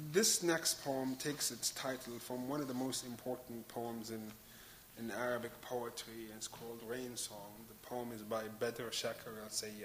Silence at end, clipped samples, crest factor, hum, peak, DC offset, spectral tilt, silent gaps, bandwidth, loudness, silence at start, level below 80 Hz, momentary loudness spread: 0 s; under 0.1%; 24 dB; none; -18 dBFS; under 0.1%; -2.5 dB/octave; none; 16 kHz; -40 LUFS; 0 s; -72 dBFS; 14 LU